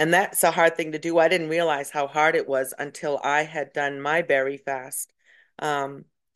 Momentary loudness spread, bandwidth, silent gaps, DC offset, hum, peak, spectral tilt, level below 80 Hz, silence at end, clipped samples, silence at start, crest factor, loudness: 11 LU; 13 kHz; none; under 0.1%; none; -6 dBFS; -3.5 dB/octave; -76 dBFS; 0.3 s; under 0.1%; 0 s; 18 dB; -24 LUFS